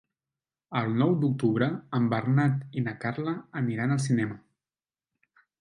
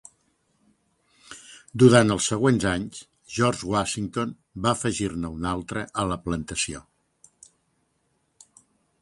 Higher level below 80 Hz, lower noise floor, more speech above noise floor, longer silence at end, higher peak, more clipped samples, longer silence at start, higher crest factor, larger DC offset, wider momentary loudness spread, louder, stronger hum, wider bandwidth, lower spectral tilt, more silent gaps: second, -68 dBFS vs -48 dBFS; first, under -90 dBFS vs -71 dBFS; first, over 63 dB vs 48 dB; second, 1.2 s vs 2.2 s; second, -10 dBFS vs -2 dBFS; neither; second, 0.7 s vs 1.3 s; second, 18 dB vs 24 dB; neither; second, 8 LU vs 20 LU; second, -28 LUFS vs -24 LUFS; neither; about the same, 11 kHz vs 11.5 kHz; first, -7.5 dB/octave vs -5 dB/octave; neither